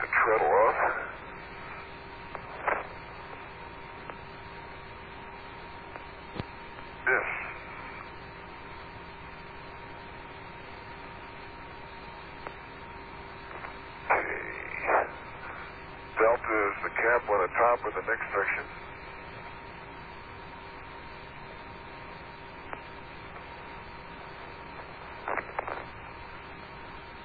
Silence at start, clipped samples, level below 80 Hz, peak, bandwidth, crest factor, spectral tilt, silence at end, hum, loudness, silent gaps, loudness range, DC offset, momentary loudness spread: 0 s; under 0.1%; -54 dBFS; -10 dBFS; 4.9 kHz; 24 dB; -8 dB/octave; 0 s; none; -32 LUFS; none; 16 LU; under 0.1%; 18 LU